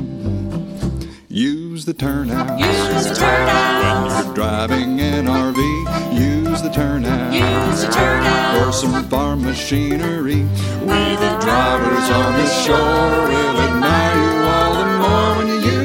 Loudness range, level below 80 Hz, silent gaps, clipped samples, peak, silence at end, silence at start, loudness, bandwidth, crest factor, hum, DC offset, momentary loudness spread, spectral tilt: 3 LU; -32 dBFS; none; under 0.1%; -2 dBFS; 0 s; 0 s; -16 LUFS; 17 kHz; 14 dB; none; under 0.1%; 6 LU; -5 dB/octave